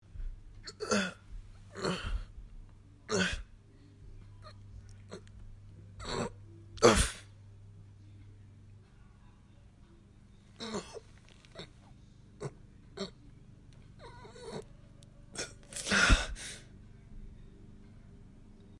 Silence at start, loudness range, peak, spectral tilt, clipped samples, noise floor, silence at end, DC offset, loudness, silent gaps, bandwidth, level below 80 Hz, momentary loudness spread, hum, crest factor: 0.15 s; 15 LU; -8 dBFS; -3.5 dB/octave; under 0.1%; -58 dBFS; 0 s; under 0.1%; -33 LUFS; none; 11.5 kHz; -44 dBFS; 27 LU; none; 30 dB